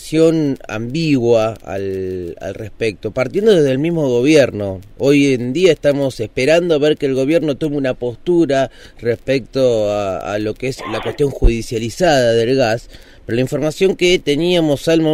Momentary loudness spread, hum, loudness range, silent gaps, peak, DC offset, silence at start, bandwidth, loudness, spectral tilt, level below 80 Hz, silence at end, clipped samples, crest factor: 10 LU; none; 4 LU; none; -2 dBFS; under 0.1%; 0 s; 15.5 kHz; -16 LUFS; -6 dB/octave; -30 dBFS; 0 s; under 0.1%; 14 dB